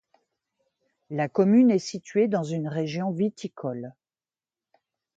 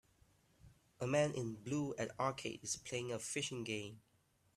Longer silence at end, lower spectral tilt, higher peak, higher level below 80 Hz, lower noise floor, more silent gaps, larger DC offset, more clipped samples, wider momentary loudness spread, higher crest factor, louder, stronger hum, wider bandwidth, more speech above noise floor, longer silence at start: first, 1.25 s vs 0.55 s; first, -7 dB/octave vs -4 dB/octave; first, -8 dBFS vs -22 dBFS; about the same, -74 dBFS vs -74 dBFS; first, under -90 dBFS vs -72 dBFS; neither; neither; neither; first, 15 LU vs 9 LU; about the same, 18 dB vs 20 dB; first, -25 LUFS vs -41 LUFS; neither; second, 7.8 kHz vs 14 kHz; first, over 66 dB vs 31 dB; first, 1.1 s vs 0.65 s